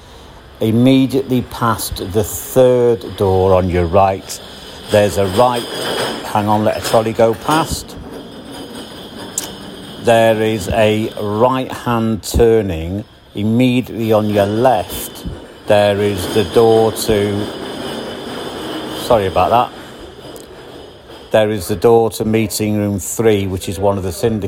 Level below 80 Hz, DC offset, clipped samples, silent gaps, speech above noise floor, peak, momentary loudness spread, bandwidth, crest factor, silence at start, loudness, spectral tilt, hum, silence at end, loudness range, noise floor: -38 dBFS; under 0.1%; under 0.1%; none; 24 dB; 0 dBFS; 18 LU; 16.5 kHz; 16 dB; 0 s; -15 LUFS; -5.5 dB/octave; none; 0 s; 4 LU; -38 dBFS